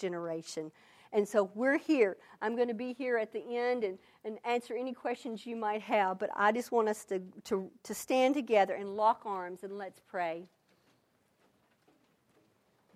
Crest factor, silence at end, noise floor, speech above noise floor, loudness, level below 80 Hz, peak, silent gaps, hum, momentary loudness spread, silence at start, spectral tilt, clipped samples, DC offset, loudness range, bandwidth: 20 dB; 2.5 s; -72 dBFS; 39 dB; -33 LUFS; -82 dBFS; -14 dBFS; none; none; 13 LU; 0 s; -4.5 dB/octave; under 0.1%; under 0.1%; 6 LU; 15.5 kHz